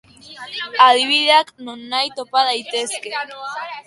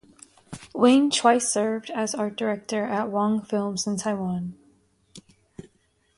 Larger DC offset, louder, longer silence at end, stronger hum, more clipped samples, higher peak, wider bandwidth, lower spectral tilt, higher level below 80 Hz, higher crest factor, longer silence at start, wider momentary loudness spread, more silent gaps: neither; first, -16 LUFS vs -24 LUFS; second, 0.05 s vs 1 s; neither; neither; first, 0 dBFS vs -4 dBFS; about the same, 11.5 kHz vs 11.5 kHz; second, 0 dB/octave vs -4 dB/octave; about the same, -70 dBFS vs -66 dBFS; about the same, 18 dB vs 20 dB; second, 0.25 s vs 0.5 s; first, 17 LU vs 13 LU; neither